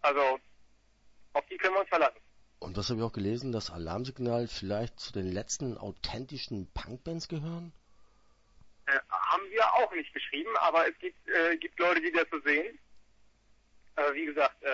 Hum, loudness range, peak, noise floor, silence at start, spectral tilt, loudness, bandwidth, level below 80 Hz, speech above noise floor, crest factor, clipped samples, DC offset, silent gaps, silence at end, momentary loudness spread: none; 9 LU; -12 dBFS; -65 dBFS; 0 s; -4.5 dB/octave; -31 LUFS; 8 kHz; -56 dBFS; 34 dB; 20 dB; under 0.1%; under 0.1%; none; 0 s; 12 LU